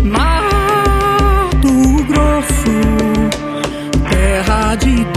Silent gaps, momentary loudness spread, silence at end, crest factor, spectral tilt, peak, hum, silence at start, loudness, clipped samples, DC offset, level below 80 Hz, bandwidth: none; 6 LU; 0 s; 12 dB; -5.5 dB/octave; 0 dBFS; none; 0 s; -13 LUFS; under 0.1%; under 0.1%; -16 dBFS; 14 kHz